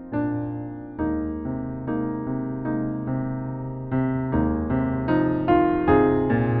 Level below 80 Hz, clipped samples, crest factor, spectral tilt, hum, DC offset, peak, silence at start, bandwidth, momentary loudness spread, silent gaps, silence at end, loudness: -40 dBFS; under 0.1%; 16 dB; -8.5 dB/octave; none; under 0.1%; -8 dBFS; 0 s; 4.5 kHz; 11 LU; none; 0 s; -24 LUFS